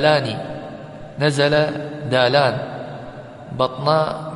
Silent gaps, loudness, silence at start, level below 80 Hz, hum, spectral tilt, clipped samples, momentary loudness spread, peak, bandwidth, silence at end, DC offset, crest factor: none; -19 LUFS; 0 s; -56 dBFS; none; -5.5 dB/octave; under 0.1%; 18 LU; -2 dBFS; 11.5 kHz; 0 s; under 0.1%; 18 dB